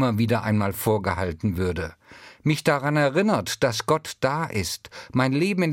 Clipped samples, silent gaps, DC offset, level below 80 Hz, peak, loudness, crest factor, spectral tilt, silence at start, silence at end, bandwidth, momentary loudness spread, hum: under 0.1%; none; under 0.1%; -52 dBFS; -6 dBFS; -24 LUFS; 18 dB; -5.5 dB/octave; 0 s; 0 s; 16.5 kHz; 7 LU; none